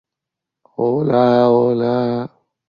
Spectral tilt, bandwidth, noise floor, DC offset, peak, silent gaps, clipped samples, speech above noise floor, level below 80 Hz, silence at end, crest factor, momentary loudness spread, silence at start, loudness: -9.5 dB/octave; 6.4 kHz; -84 dBFS; under 0.1%; -2 dBFS; none; under 0.1%; 69 dB; -62 dBFS; 0.4 s; 14 dB; 14 LU; 0.8 s; -16 LUFS